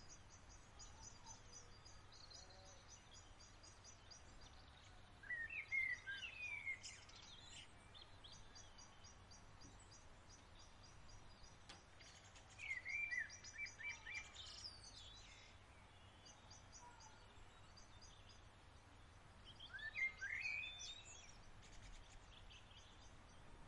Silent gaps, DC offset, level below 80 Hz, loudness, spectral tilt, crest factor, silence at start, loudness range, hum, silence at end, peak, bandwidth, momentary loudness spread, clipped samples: none; under 0.1%; -68 dBFS; -52 LUFS; -1.5 dB/octave; 22 dB; 0 s; 15 LU; none; 0 s; -34 dBFS; 11 kHz; 19 LU; under 0.1%